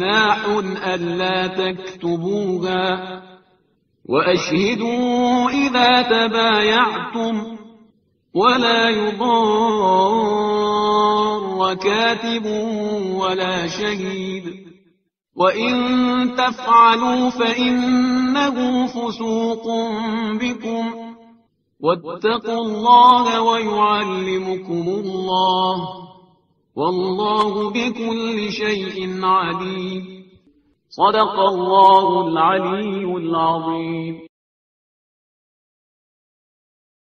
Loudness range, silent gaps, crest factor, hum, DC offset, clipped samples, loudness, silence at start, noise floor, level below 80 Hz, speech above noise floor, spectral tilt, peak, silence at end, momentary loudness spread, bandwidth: 7 LU; none; 18 dB; none; under 0.1%; under 0.1%; -18 LUFS; 0 s; -63 dBFS; -58 dBFS; 45 dB; -2.5 dB/octave; 0 dBFS; 2.9 s; 11 LU; 6.8 kHz